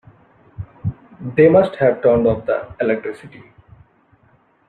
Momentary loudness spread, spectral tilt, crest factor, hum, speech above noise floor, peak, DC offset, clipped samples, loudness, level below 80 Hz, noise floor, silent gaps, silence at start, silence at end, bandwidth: 21 LU; -9.5 dB/octave; 18 dB; none; 40 dB; -2 dBFS; under 0.1%; under 0.1%; -17 LUFS; -48 dBFS; -56 dBFS; none; 0.6 s; 1.4 s; 4.5 kHz